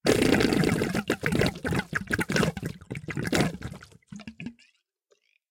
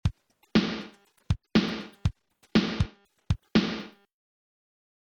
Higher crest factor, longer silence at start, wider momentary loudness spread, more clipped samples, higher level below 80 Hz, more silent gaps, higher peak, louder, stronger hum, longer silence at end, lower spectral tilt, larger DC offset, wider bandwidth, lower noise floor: about the same, 22 dB vs 20 dB; about the same, 0.05 s vs 0.05 s; first, 20 LU vs 10 LU; neither; second, -48 dBFS vs -42 dBFS; neither; first, -6 dBFS vs -10 dBFS; about the same, -27 LUFS vs -29 LUFS; neither; second, 1 s vs 1.15 s; second, -5 dB/octave vs -6.5 dB/octave; neither; first, 17 kHz vs 8.6 kHz; first, -70 dBFS vs -48 dBFS